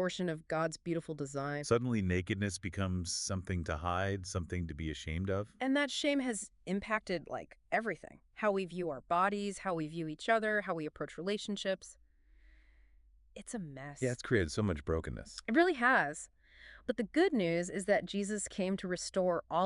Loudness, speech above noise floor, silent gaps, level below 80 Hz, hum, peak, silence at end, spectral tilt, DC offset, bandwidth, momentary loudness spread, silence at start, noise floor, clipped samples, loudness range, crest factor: -35 LUFS; 29 dB; none; -58 dBFS; none; -16 dBFS; 0 s; -5 dB/octave; under 0.1%; 11.5 kHz; 11 LU; 0 s; -64 dBFS; under 0.1%; 6 LU; 20 dB